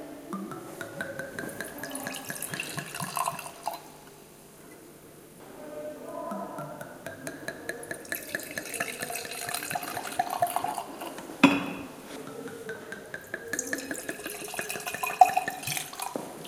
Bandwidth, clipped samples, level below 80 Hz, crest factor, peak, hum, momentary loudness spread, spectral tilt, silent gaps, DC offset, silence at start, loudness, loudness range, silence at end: 17 kHz; under 0.1%; -68 dBFS; 32 dB; -2 dBFS; none; 14 LU; -3 dB/octave; none; under 0.1%; 0 s; -32 LUFS; 11 LU; 0 s